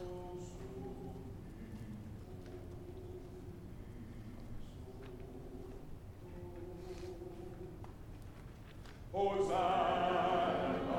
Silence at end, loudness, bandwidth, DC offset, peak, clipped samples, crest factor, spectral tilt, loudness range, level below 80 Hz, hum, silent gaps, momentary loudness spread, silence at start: 0 s; -41 LUFS; 17.5 kHz; under 0.1%; -22 dBFS; under 0.1%; 18 dB; -6.5 dB/octave; 14 LU; -54 dBFS; none; none; 19 LU; 0 s